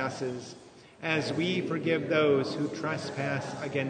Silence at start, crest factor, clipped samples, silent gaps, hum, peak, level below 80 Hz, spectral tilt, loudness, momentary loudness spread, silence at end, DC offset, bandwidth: 0 s; 18 dB; under 0.1%; none; none; -12 dBFS; -70 dBFS; -5.5 dB/octave; -30 LUFS; 12 LU; 0 s; under 0.1%; 9.6 kHz